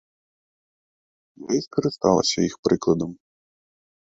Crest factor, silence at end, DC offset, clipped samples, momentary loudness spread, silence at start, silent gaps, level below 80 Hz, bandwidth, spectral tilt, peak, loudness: 22 dB; 1 s; under 0.1%; under 0.1%; 7 LU; 1.4 s; 2.59-2.63 s; -56 dBFS; 8 kHz; -5 dB/octave; -4 dBFS; -23 LUFS